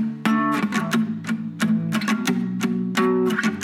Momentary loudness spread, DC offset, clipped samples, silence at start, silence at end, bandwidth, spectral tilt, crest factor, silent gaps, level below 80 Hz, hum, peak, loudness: 4 LU; under 0.1%; under 0.1%; 0 s; 0 s; 16.5 kHz; -5.5 dB/octave; 14 dB; none; -72 dBFS; none; -8 dBFS; -22 LUFS